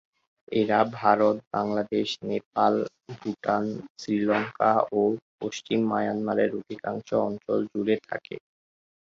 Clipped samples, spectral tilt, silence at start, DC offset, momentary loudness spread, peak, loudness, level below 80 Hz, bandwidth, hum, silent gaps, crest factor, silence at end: under 0.1%; -6 dB/octave; 0.5 s; under 0.1%; 12 LU; -6 dBFS; -26 LUFS; -68 dBFS; 7.6 kHz; none; 1.47-1.51 s, 2.46-2.52 s, 3.90-3.95 s, 5.22-5.38 s; 20 dB; 0.65 s